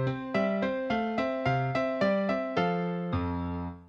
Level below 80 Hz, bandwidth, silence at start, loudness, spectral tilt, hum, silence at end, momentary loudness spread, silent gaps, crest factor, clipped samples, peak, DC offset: -52 dBFS; 7.6 kHz; 0 s; -30 LUFS; -8 dB/octave; none; 0 s; 4 LU; none; 16 dB; under 0.1%; -14 dBFS; under 0.1%